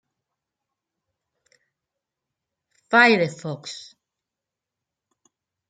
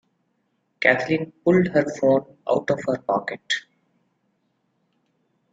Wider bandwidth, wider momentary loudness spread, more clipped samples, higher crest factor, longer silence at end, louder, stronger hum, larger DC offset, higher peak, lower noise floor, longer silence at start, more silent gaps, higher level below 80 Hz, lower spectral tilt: about the same, 9.4 kHz vs 9 kHz; first, 21 LU vs 7 LU; neither; about the same, 26 dB vs 24 dB; about the same, 1.9 s vs 1.9 s; first, -18 LUFS vs -22 LUFS; neither; neither; about the same, -2 dBFS vs -2 dBFS; first, -87 dBFS vs -71 dBFS; first, 2.9 s vs 0.8 s; neither; second, -78 dBFS vs -62 dBFS; second, -4.5 dB/octave vs -6 dB/octave